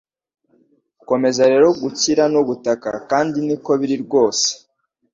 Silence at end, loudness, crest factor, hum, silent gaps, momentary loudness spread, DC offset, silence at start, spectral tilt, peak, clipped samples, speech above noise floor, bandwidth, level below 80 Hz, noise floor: 0.6 s; -17 LUFS; 16 dB; none; none; 8 LU; under 0.1%; 1.1 s; -3.5 dB/octave; -2 dBFS; under 0.1%; 42 dB; 7.8 kHz; -60 dBFS; -59 dBFS